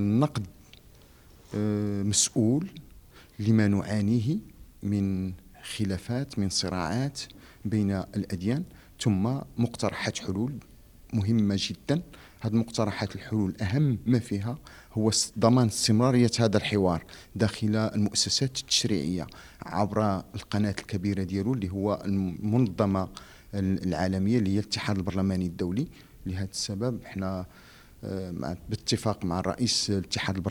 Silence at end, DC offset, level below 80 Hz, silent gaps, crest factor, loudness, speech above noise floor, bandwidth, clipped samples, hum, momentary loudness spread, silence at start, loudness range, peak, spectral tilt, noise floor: 0 s; under 0.1%; -54 dBFS; none; 22 dB; -28 LUFS; 27 dB; 18 kHz; under 0.1%; none; 13 LU; 0 s; 6 LU; -6 dBFS; -5 dB/octave; -54 dBFS